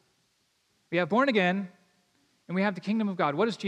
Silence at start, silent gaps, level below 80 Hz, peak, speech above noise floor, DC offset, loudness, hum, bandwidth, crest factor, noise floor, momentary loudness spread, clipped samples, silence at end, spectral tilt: 0.9 s; none; -86 dBFS; -12 dBFS; 45 dB; under 0.1%; -27 LUFS; none; 9.8 kHz; 18 dB; -72 dBFS; 10 LU; under 0.1%; 0 s; -6.5 dB/octave